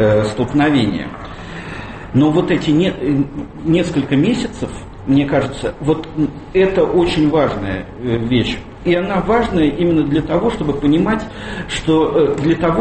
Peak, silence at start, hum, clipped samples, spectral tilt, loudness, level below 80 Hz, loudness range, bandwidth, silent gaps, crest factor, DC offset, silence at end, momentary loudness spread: -2 dBFS; 0 s; none; under 0.1%; -7 dB/octave; -16 LUFS; -36 dBFS; 2 LU; 8.8 kHz; none; 14 dB; under 0.1%; 0 s; 12 LU